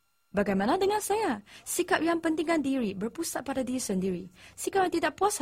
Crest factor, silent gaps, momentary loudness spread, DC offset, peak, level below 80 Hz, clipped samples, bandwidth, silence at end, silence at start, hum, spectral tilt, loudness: 18 dB; none; 7 LU; under 0.1%; -12 dBFS; -60 dBFS; under 0.1%; 16 kHz; 0 s; 0.35 s; none; -4 dB/octave; -29 LUFS